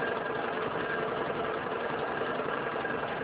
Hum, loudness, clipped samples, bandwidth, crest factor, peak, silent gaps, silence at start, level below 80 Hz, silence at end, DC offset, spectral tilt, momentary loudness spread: none; -33 LUFS; under 0.1%; 4 kHz; 14 dB; -18 dBFS; none; 0 s; -62 dBFS; 0 s; under 0.1%; -3 dB/octave; 1 LU